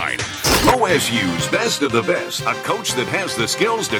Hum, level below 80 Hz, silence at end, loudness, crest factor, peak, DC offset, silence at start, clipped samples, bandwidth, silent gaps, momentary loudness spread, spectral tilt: none; -38 dBFS; 0 s; -18 LUFS; 16 dB; -2 dBFS; under 0.1%; 0 s; under 0.1%; over 20 kHz; none; 6 LU; -3 dB/octave